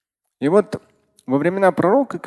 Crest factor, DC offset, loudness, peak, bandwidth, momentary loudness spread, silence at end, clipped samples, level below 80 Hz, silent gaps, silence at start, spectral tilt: 18 dB; under 0.1%; -18 LUFS; -2 dBFS; 12 kHz; 11 LU; 0 s; under 0.1%; -62 dBFS; none; 0.4 s; -7.5 dB/octave